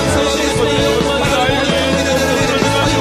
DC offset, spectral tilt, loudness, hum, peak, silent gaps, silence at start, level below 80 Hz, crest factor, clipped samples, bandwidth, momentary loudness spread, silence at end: under 0.1%; -4 dB/octave; -14 LUFS; none; 0 dBFS; none; 0 s; -30 dBFS; 14 dB; under 0.1%; 15.5 kHz; 1 LU; 0 s